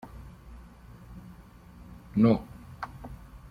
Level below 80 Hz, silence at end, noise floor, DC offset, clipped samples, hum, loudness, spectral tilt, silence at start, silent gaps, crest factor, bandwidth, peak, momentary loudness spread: -50 dBFS; 0.15 s; -50 dBFS; under 0.1%; under 0.1%; none; -28 LUFS; -9 dB/octave; 0.2 s; none; 22 dB; 6 kHz; -10 dBFS; 27 LU